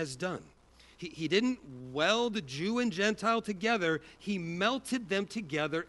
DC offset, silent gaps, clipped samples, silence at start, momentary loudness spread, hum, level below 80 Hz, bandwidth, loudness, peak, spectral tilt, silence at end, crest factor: under 0.1%; none; under 0.1%; 0 s; 10 LU; none; -66 dBFS; 11.5 kHz; -32 LUFS; -12 dBFS; -4.5 dB/octave; 0 s; 20 dB